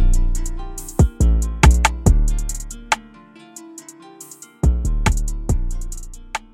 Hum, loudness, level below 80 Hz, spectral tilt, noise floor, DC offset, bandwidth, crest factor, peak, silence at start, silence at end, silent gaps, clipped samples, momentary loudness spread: none; -20 LUFS; -20 dBFS; -5 dB/octave; -44 dBFS; under 0.1%; 15.5 kHz; 18 dB; 0 dBFS; 0 s; 0.15 s; none; under 0.1%; 23 LU